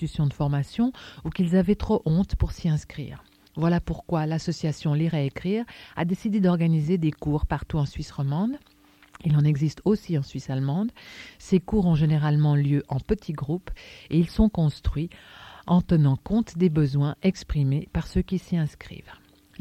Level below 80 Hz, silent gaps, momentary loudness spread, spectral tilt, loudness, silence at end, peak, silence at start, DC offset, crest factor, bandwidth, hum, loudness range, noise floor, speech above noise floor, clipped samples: -38 dBFS; none; 13 LU; -8 dB/octave; -25 LUFS; 0.45 s; -6 dBFS; 0 s; under 0.1%; 18 dB; 9.2 kHz; none; 3 LU; -53 dBFS; 29 dB; under 0.1%